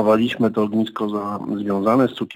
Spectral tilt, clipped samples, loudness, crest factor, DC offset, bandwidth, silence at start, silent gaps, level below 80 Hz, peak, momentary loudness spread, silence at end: -7.5 dB/octave; under 0.1%; -20 LUFS; 14 dB; under 0.1%; 16 kHz; 0 s; none; -62 dBFS; -4 dBFS; 8 LU; 0 s